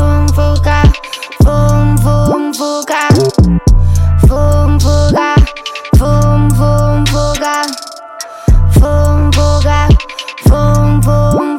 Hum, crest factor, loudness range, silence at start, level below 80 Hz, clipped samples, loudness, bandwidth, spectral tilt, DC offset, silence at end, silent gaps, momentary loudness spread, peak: none; 8 dB; 2 LU; 0 s; -14 dBFS; under 0.1%; -10 LUFS; 16 kHz; -6.5 dB/octave; under 0.1%; 0 s; none; 7 LU; 0 dBFS